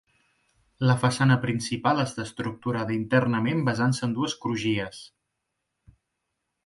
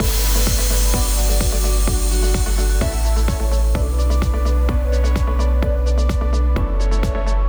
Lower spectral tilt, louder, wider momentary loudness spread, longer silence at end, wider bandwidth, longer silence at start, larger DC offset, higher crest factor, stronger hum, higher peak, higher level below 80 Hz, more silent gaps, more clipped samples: first, -6 dB/octave vs -4.5 dB/octave; second, -25 LUFS vs -19 LUFS; first, 9 LU vs 2 LU; first, 1.6 s vs 0 s; second, 11.5 kHz vs over 20 kHz; first, 0.8 s vs 0 s; neither; first, 20 dB vs 12 dB; neither; second, -8 dBFS vs -4 dBFS; second, -60 dBFS vs -16 dBFS; neither; neither